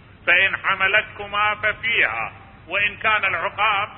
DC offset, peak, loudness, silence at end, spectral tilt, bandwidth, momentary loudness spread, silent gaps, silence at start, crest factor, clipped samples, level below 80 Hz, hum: under 0.1%; -2 dBFS; -19 LUFS; 0 s; -7.5 dB/octave; 4.8 kHz; 8 LU; none; 0.25 s; 18 dB; under 0.1%; -50 dBFS; none